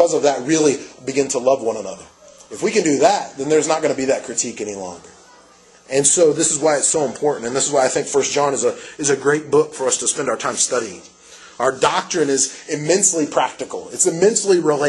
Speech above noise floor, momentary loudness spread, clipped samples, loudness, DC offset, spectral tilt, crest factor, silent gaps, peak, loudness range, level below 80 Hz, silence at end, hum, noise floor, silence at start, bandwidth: 30 dB; 10 LU; under 0.1%; -18 LUFS; under 0.1%; -3 dB/octave; 18 dB; none; 0 dBFS; 3 LU; -60 dBFS; 0 s; none; -48 dBFS; 0 s; 12 kHz